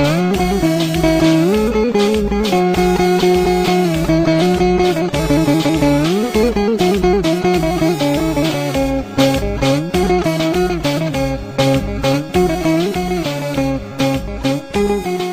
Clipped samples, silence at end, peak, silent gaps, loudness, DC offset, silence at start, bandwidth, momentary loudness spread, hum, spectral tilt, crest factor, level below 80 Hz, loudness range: under 0.1%; 0 s; 0 dBFS; none; -15 LUFS; under 0.1%; 0 s; 15.5 kHz; 5 LU; none; -6 dB/octave; 14 dB; -30 dBFS; 3 LU